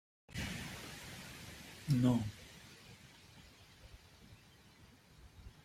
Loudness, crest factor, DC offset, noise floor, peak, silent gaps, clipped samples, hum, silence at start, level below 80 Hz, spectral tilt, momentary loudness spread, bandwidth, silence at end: -39 LUFS; 24 dB; under 0.1%; -62 dBFS; -20 dBFS; none; under 0.1%; none; 0.3 s; -62 dBFS; -6 dB/octave; 28 LU; 16 kHz; 0.05 s